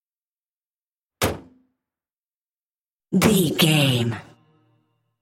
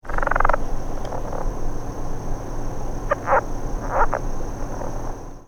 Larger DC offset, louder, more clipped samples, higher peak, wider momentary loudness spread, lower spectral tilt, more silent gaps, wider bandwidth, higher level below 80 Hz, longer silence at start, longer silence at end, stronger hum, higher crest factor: neither; first, -20 LUFS vs -26 LUFS; neither; about the same, -2 dBFS vs 0 dBFS; about the same, 12 LU vs 11 LU; second, -4.5 dB/octave vs -6 dB/octave; first, 2.13-2.70 s, 2.80-3.00 s vs none; first, 16.5 kHz vs 7 kHz; second, -54 dBFS vs -26 dBFS; first, 1.2 s vs 0.05 s; first, 1 s vs 0.05 s; neither; about the same, 22 dB vs 22 dB